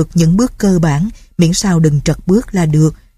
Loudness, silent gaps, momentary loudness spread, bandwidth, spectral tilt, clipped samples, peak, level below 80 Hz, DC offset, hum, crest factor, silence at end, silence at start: -13 LUFS; none; 4 LU; 14 kHz; -6.5 dB/octave; under 0.1%; 0 dBFS; -30 dBFS; under 0.1%; none; 12 dB; 0.2 s; 0 s